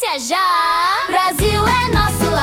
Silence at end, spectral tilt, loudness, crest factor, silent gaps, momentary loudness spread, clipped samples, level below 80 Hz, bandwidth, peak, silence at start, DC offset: 0 s; -4 dB/octave; -15 LUFS; 14 dB; none; 2 LU; under 0.1%; -30 dBFS; 18 kHz; -2 dBFS; 0 s; under 0.1%